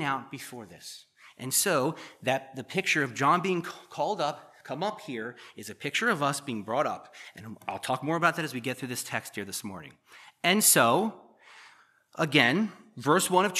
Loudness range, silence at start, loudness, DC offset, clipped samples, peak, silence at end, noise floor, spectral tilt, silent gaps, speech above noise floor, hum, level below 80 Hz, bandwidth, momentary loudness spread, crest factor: 6 LU; 0 s; -27 LUFS; under 0.1%; under 0.1%; -6 dBFS; 0 s; -59 dBFS; -3 dB/octave; none; 30 dB; none; -80 dBFS; 15 kHz; 21 LU; 24 dB